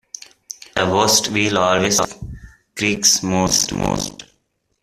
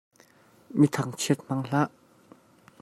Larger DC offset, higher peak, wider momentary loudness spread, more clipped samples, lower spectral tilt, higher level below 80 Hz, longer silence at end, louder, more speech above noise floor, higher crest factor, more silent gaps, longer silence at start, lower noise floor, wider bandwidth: neither; first, 0 dBFS vs -8 dBFS; first, 21 LU vs 7 LU; neither; second, -2.5 dB/octave vs -5.5 dB/octave; first, -44 dBFS vs -68 dBFS; second, 0.6 s vs 0.95 s; first, -17 LUFS vs -27 LUFS; first, 50 dB vs 33 dB; about the same, 20 dB vs 22 dB; neither; second, 0.5 s vs 0.7 s; first, -67 dBFS vs -58 dBFS; first, 16 kHz vs 14.5 kHz